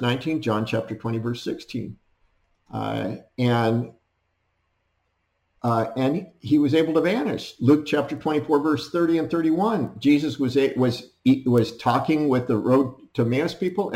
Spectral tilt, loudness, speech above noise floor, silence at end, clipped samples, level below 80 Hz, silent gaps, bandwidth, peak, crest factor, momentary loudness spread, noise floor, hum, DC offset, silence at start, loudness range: -7.5 dB/octave; -23 LUFS; 50 dB; 0 s; under 0.1%; -62 dBFS; none; 15.5 kHz; -8 dBFS; 16 dB; 10 LU; -72 dBFS; none; under 0.1%; 0 s; 7 LU